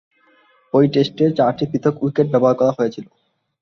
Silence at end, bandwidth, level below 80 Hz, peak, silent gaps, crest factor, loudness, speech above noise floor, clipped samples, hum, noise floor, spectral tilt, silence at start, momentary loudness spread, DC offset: 0.6 s; 6.8 kHz; -60 dBFS; -2 dBFS; none; 16 dB; -17 LUFS; 39 dB; under 0.1%; none; -56 dBFS; -8 dB/octave; 0.75 s; 6 LU; under 0.1%